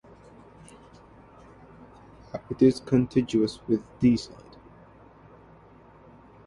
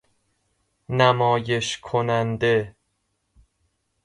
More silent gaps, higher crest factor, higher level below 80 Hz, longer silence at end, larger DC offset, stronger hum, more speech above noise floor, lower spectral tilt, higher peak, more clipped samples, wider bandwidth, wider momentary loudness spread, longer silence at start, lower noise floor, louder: neither; about the same, 20 dB vs 22 dB; about the same, -56 dBFS vs -56 dBFS; first, 2.2 s vs 1.35 s; neither; neither; second, 28 dB vs 52 dB; first, -7.5 dB/octave vs -5 dB/octave; second, -8 dBFS vs -4 dBFS; neither; about the same, 11 kHz vs 11.5 kHz; first, 18 LU vs 7 LU; first, 2.35 s vs 0.9 s; second, -53 dBFS vs -73 dBFS; second, -25 LUFS vs -22 LUFS